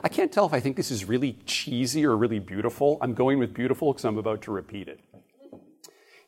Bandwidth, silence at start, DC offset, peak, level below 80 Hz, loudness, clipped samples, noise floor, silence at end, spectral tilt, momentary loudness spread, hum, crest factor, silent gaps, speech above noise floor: 16 kHz; 0.05 s; under 0.1%; -6 dBFS; -64 dBFS; -26 LUFS; under 0.1%; -54 dBFS; 0.7 s; -5.5 dB/octave; 9 LU; none; 20 dB; none; 28 dB